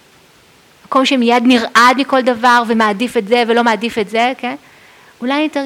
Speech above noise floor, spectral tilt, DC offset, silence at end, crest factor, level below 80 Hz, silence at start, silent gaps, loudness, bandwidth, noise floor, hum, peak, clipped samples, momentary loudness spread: 34 dB; -3.5 dB/octave; under 0.1%; 0 s; 14 dB; -58 dBFS; 0.9 s; none; -13 LUFS; 16 kHz; -47 dBFS; none; 0 dBFS; under 0.1%; 9 LU